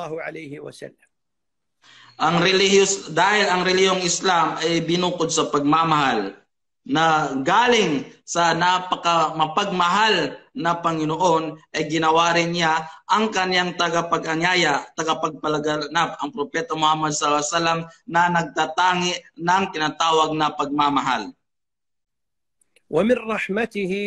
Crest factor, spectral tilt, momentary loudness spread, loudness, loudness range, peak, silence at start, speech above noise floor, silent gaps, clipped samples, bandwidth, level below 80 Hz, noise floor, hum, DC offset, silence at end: 16 dB; -3.5 dB/octave; 9 LU; -20 LUFS; 3 LU; -4 dBFS; 0 s; 66 dB; none; under 0.1%; 11 kHz; -60 dBFS; -87 dBFS; none; under 0.1%; 0 s